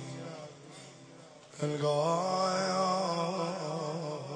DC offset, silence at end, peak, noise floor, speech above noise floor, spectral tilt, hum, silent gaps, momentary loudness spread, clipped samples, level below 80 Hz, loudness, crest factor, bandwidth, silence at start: under 0.1%; 0 s; -18 dBFS; -53 dBFS; 23 dB; -5 dB/octave; none; none; 21 LU; under 0.1%; -80 dBFS; -32 LUFS; 16 dB; 10 kHz; 0 s